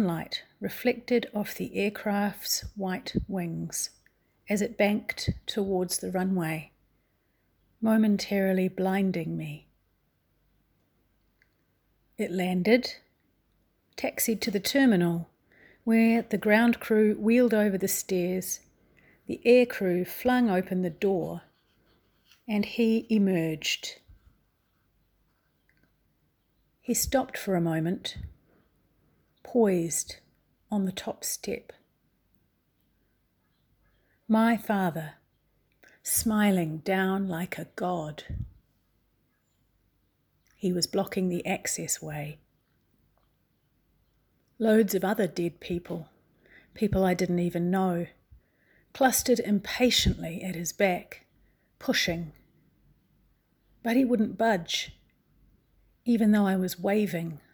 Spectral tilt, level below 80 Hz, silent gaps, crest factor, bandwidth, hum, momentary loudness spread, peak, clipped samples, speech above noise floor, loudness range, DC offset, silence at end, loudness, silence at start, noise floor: -4.5 dB/octave; -54 dBFS; none; 22 dB; over 20 kHz; none; 14 LU; -8 dBFS; under 0.1%; 45 dB; 9 LU; under 0.1%; 0.15 s; -27 LUFS; 0 s; -71 dBFS